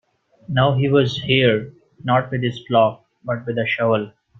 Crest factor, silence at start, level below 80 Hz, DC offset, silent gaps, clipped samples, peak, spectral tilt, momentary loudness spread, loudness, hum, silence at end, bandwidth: 18 dB; 0.5 s; -54 dBFS; under 0.1%; none; under 0.1%; -2 dBFS; -7 dB/octave; 11 LU; -19 LUFS; none; 0.3 s; 7 kHz